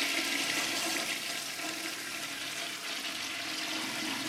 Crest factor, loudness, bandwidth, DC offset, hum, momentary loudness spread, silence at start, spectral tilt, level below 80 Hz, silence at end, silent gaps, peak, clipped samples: 20 dB; -33 LUFS; 16 kHz; under 0.1%; none; 6 LU; 0 s; -0.5 dB/octave; -74 dBFS; 0 s; none; -16 dBFS; under 0.1%